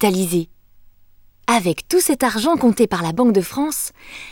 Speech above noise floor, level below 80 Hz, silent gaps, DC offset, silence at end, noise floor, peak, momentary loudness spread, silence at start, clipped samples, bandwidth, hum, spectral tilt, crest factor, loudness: 32 dB; -50 dBFS; none; under 0.1%; 0 s; -49 dBFS; -2 dBFS; 10 LU; 0 s; under 0.1%; over 20 kHz; 50 Hz at -50 dBFS; -4.5 dB/octave; 16 dB; -18 LUFS